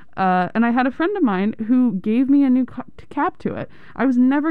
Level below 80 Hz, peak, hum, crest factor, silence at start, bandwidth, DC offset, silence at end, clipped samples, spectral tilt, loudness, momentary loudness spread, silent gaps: -56 dBFS; -8 dBFS; none; 10 dB; 0.15 s; 4.6 kHz; 1%; 0 s; under 0.1%; -9 dB/octave; -19 LUFS; 12 LU; none